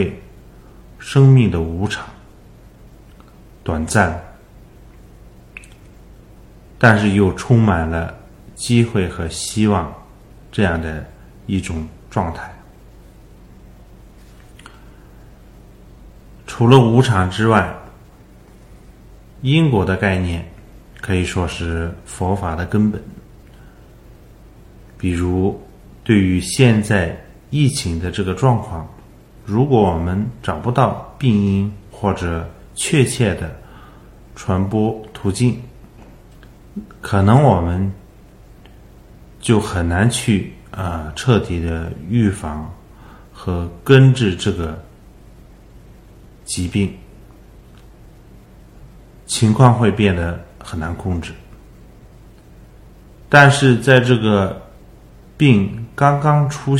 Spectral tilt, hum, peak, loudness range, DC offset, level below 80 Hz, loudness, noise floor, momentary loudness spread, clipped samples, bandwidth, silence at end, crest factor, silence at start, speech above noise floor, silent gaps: -6 dB/octave; none; 0 dBFS; 9 LU; under 0.1%; -38 dBFS; -17 LUFS; -43 dBFS; 19 LU; under 0.1%; 13.5 kHz; 0 s; 18 dB; 0 s; 28 dB; none